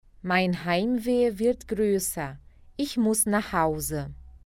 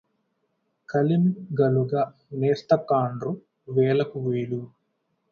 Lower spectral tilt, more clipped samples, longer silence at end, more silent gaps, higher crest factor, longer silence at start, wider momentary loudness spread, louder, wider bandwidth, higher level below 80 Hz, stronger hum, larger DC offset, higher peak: second, -4.5 dB/octave vs -9.5 dB/octave; neither; second, 0.15 s vs 0.65 s; neither; about the same, 16 dB vs 20 dB; second, 0.25 s vs 0.9 s; about the same, 11 LU vs 10 LU; about the same, -26 LUFS vs -25 LUFS; first, 17 kHz vs 7 kHz; first, -48 dBFS vs -64 dBFS; neither; neither; second, -10 dBFS vs -6 dBFS